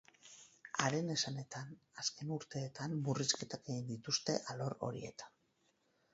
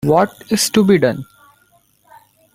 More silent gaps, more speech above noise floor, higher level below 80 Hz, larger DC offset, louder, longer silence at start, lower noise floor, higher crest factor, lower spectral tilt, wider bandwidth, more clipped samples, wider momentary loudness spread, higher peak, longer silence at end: neither; second, 37 dB vs 42 dB; second, -76 dBFS vs -52 dBFS; neither; second, -40 LUFS vs -15 LUFS; first, 0.25 s vs 0.05 s; first, -78 dBFS vs -56 dBFS; first, 28 dB vs 16 dB; about the same, -4 dB/octave vs -4.5 dB/octave; second, 8 kHz vs 16 kHz; neither; first, 18 LU vs 7 LU; second, -14 dBFS vs -2 dBFS; second, 0.85 s vs 1.3 s